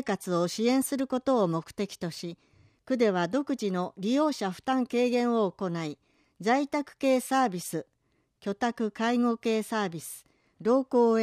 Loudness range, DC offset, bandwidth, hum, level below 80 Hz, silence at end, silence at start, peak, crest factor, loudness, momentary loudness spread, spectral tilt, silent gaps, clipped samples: 2 LU; under 0.1%; 15 kHz; none; -70 dBFS; 0 s; 0 s; -12 dBFS; 16 dB; -28 LUFS; 11 LU; -5 dB/octave; none; under 0.1%